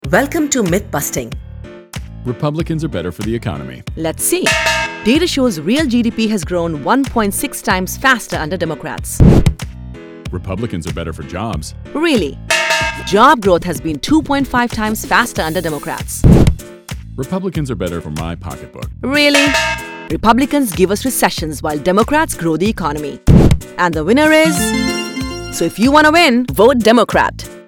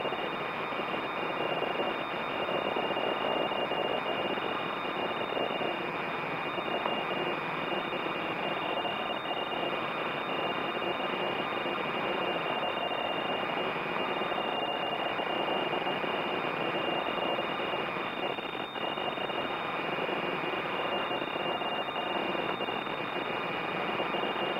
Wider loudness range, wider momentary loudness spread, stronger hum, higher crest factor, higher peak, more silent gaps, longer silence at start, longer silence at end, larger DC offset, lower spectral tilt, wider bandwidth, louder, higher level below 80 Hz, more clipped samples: first, 6 LU vs 1 LU; first, 15 LU vs 2 LU; neither; about the same, 14 dB vs 16 dB; first, 0 dBFS vs -16 dBFS; neither; about the same, 0.05 s vs 0 s; about the same, 0.05 s vs 0 s; neither; about the same, -5 dB/octave vs -5.5 dB/octave; first, over 20 kHz vs 16 kHz; first, -14 LUFS vs -32 LUFS; first, -26 dBFS vs -68 dBFS; first, 0.2% vs under 0.1%